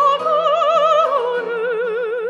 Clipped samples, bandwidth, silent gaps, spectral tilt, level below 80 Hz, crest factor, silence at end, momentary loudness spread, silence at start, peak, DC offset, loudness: under 0.1%; 9.2 kHz; none; -3 dB/octave; -88 dBFS; 12 dB; 0 s; 7 LU; 0 s; -4 dBFS; under 0.1%; -17 LUFS